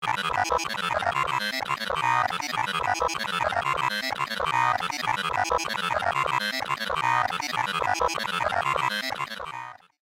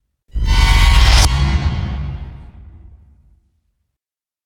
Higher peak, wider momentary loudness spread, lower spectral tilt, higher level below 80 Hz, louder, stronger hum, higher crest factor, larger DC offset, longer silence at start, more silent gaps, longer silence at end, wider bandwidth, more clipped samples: second, -10 dBFS vs 0 dBFS; second, 4 LU vs 19 LU; second, -2.5 dB/octave vs -4 dB/octave; second, -54 dBFS vs -18 dBFS; second, -26 LUFS vs -15 LUFS; neither; about the same, 18 dB vs 16 dB; neither; second, 0 s vs 0.35 s; neither; second, 0.3 s vs 1.95 s; about the same, 17 kHz vs 16 kHz; neither